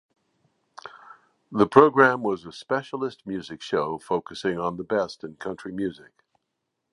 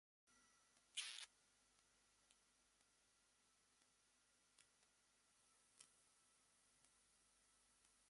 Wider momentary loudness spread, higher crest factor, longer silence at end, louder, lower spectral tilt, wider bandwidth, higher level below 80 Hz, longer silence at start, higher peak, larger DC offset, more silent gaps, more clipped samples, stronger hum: about the same, 18 LU vs 19 LU; second, 26 dB vs 32 dB; first, 1 s vs 0 s; first, -24 LUFS vs -53 LUFS; first, -6.5 dB/octave vs 2 dB/octave; about the same, 11 kHz vs 11.5 kHz; first, -62 dBFS vs under -90 dBFS; first, 0.85 s vs 0.25 s; first, 0 dBFS vs -36 dBFS; neither; neither; neither; neither